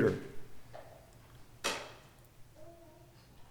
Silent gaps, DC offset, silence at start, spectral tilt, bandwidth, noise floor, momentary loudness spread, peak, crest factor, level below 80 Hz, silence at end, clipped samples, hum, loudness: none; under 0.1%; 0 s; -4.5 dB/octave; over 20 kHz; -58 dBFS; 22 LU; -18 dBFS; 24 dB; -62 dBFS; 0 s; under 0.1%; none; -40 LUFS